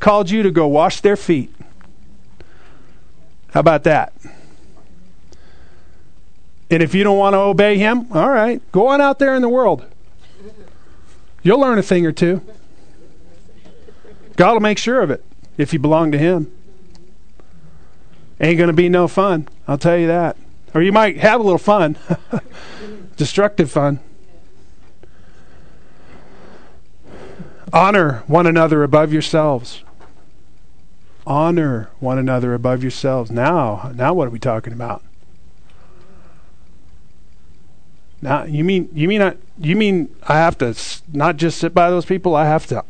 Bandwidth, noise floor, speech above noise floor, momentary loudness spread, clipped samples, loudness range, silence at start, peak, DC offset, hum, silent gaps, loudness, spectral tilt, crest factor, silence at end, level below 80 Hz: 9.4 kHz; -50 dBFS; 35 dB; 13 LU; under 0.1%; 7 LU; 0 s; 0 dBFS; 3%; none; none; -15 LUFS; -6.5 dB/octave; 18 dB; 0.1 s; -48 dBFS